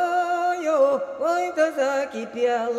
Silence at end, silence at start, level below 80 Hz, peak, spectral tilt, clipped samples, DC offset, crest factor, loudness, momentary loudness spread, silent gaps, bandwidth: 0 s; 0 s; -72 dBFS; -8 dBFS; -3.5 dB/octave; under 0.1%; under 0.1%; 14 dB; -23 LUFS; 5 LU; none; 13.5 kHz